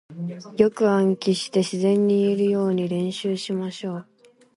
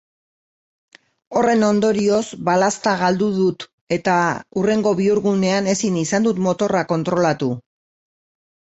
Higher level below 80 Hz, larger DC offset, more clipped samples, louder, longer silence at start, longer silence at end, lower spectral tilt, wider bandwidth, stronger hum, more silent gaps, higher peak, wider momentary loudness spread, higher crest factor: second, -66 dBFS vs -58 dBFS; neither; neither; second, -22 LUFS vs -19 LUFS; second, 0.1 s vs 1.3 s; second, 0.55 s vs 1.05 s; about the same, -6.5 dB/octave vs -5.5 dB/octave; first, 11.5 kHz vs 8.2 kHz; neither; second, none vs 3.73-3.87 s; about the same, -4 dBFS vs -4 dBFS; first, 13 LU vs 5 LU; about the same, 18 dB vs 16 dB